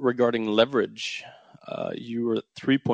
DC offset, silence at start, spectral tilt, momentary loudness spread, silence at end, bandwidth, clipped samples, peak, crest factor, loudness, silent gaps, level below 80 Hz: under 0.1%; 0 s; -5.5 dB/octave; 11 LU; 0 s; 9 kHz; under 0.1%; -4 dBFS; 22 dB; -26 LUFS; none; -68 dBFS